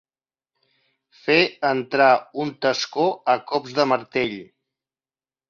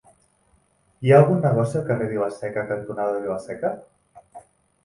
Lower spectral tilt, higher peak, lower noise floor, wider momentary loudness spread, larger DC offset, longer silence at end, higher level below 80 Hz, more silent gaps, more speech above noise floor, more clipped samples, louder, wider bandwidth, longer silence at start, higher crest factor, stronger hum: second, -4.5 dB/octave vs -8.5 dB/octave; about the same, -4 dBFS vs -2 dBFS; first, under -90 dBFS vs -63 dBFS; second, 9 LU vs 13 LU; neither; first, 1.05 s vs 0.45 s; second, -66 dBFS vs -60 dBFS; neither; first, over 69 dB vs 42 dB; neither; about the same, -21 LUFS vs -22 LUFS; second, 7.4 kHz vs 11.5 kHz; first, 1.25 s vs 1 s; about the same, 20 dB vs 22 dB; neither